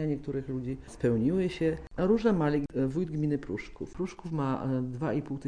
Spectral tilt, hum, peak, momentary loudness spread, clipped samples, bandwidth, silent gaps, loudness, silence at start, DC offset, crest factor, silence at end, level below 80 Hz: -8.5 dB/octave; none; -14 dBFS; 11 LU; under 0.1%; 10.5 kHz; none; -31 LUFS; 0 s; 0.1%; 16 dB; 0 s; -50 dBFS